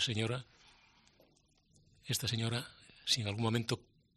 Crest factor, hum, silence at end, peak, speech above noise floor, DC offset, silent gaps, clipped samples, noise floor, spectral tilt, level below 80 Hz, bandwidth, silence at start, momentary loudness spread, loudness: 22 dB; none; 0.4 s; -18 dBFS; 35 dB; under 0.1%; none; under 0.1%; -71 dBFS; -4 dB/octave; -68 dBFS; 13 kHz; 0 s; 10 LU; -36 LUFS